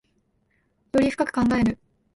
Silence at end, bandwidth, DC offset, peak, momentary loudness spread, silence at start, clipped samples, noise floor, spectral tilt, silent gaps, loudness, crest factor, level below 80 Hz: 0.4 s; 11.5 kHz; under 0.1%; -8 dBFS; 5 LU; 0.95 s; under 0.1%; -68 dBFS; -6.5 dB/octave; none; -23 LUFS; 16 dB; -48 dBFS